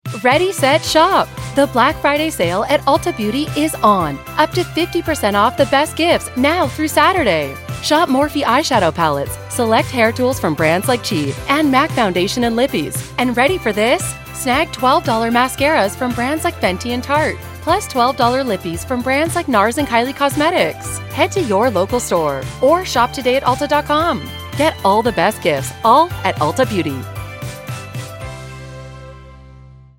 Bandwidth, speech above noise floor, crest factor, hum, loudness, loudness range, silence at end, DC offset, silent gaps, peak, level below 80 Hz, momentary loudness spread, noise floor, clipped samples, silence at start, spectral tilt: 17 kHz; 25 dB; 16 dB; none; -16 LUFS; 2 LU; 0.4 s; under 0.1%; none; 0 dBFS; -40 dBFS; 9 LU; -40 dBFS; under 0.1%; 0.05 s; -4.5 dB/octave